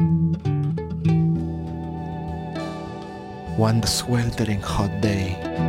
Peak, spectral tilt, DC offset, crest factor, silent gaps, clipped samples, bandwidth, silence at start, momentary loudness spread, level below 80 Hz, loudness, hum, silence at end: -8 dBFS; -6 dB/octave; under 0.1%; 16 dB; none; under 0.1%; 16 kHz; 0 s; 11 LU; -40 dBFS; -24 LUFS; none; 0 s